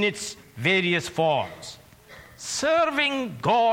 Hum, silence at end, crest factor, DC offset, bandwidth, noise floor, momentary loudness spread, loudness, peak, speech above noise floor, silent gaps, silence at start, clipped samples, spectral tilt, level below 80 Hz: none; 0 s; 18 dB; under 0.1%; 16.5 kHz; -48 dBFS; 14 LU; -24 LUFS; -8 dBFS; 24 dB; none; 0 s; under 0.1%; -3.5 dB/octave; -60 dBFS